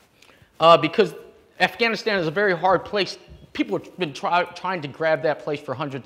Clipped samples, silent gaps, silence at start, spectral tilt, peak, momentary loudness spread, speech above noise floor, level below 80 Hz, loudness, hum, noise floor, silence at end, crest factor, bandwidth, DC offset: under 0.1%; none; 0.6 s; -5 dB/octave; -2 dBFS; 12 LU; 32 dB; -58 dBFS; -22 LUFS; none; -54 dBFS; 0.05 s; 20 dB; 15 kHz; under 0.1%